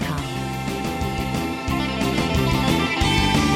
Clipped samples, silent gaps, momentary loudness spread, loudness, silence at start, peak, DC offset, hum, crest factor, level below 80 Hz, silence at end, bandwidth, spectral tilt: under 0.1%; none; 8 LU; -22 LUFS; 0 s; -6 dBFS; under 0.1%; none; 16 dB; -32 dBFS; 0 s; 16.5 kHz; -5 dB/octave